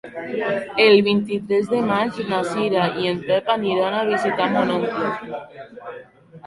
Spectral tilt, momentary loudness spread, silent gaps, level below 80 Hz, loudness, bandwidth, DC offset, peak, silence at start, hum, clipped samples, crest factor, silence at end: -6 dB/octave; 18 LU; none; -62 dBFS; -20 LUFS; 11.5 kHz; under 0.1%; -2 dBFS; 0.05 s; none; under 0.1%; 18 dB; 0 s